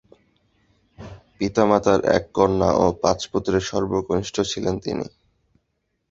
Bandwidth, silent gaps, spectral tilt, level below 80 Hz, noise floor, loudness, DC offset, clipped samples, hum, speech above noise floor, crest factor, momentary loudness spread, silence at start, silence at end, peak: 7.8 kHz; none; -5.5 dB/octave; -44 dBFS; -74 dBFS; -21 LUFS; under 0.1%; under 0.1%; none; 53 dB; 22 dB; 12 LU; 1 s; 1.05 s; -2 dBFS